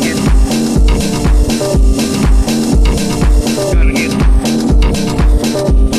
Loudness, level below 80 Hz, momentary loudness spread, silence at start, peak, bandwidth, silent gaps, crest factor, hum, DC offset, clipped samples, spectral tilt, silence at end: -12 LUFS; -12 dBFS; 1 LU; 0 s; 0 dBFS; 14 kHz; none; 10 dB; none; under 0.1%; under 0.1%; -5.5 dB/octave; 0 s